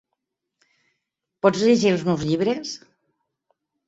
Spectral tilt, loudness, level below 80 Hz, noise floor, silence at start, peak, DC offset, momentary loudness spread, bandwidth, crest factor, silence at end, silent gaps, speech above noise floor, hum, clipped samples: -5.5 dB/octave; -21 LUFS; -60 dBFS; -80 dBFS; 1.45 s; -4 dBFS; under 0.1%; 13 LU; 8 kHz; 22 dB; 1.1 s; none; 60 dB; none; under 0.1%